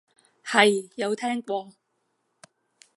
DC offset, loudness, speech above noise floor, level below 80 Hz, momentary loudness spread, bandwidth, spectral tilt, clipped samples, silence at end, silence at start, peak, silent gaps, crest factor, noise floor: under 0.1%; -24 LUFS; 51 dB; -82 dBFS; 13 LU; 11.5 kHz; -3 dB/octave; under 0.1%; 1.25 s; 0.45 s; -4 dBFS; none; 24 dB; -75 dBFS